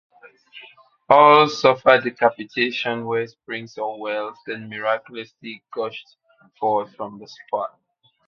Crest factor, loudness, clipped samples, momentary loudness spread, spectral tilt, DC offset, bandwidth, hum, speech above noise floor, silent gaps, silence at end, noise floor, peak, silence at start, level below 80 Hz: 22 dB; -20 LUFS; under 0.1%; 20 LU; -5 dB/octave; under 0.1%; 7 kHz; none; 27 dB; none; 0.6 s; -48 dBFS; 0 dBFS; 0.55 s; -64 dBFS